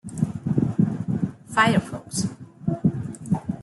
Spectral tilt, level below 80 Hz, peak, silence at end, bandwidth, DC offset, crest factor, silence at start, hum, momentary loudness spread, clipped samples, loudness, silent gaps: -6 dB/octave; -52 dBFS; -6 dBFS; 0 s; 12 kHz; under 0.1%; 18 dB; 0.05 s; none; 10 LU; under 0.1%; -25 LUFS; none